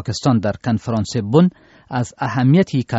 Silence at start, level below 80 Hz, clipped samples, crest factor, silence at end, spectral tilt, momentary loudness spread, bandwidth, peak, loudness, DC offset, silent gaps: 0 s; -50 dBFS; under 0.1%; 16 dB; 0 s; -7 dB/octave; 9 LU; 8 kHz; -2 dBFS; -18 LUFS; under 0.1%; none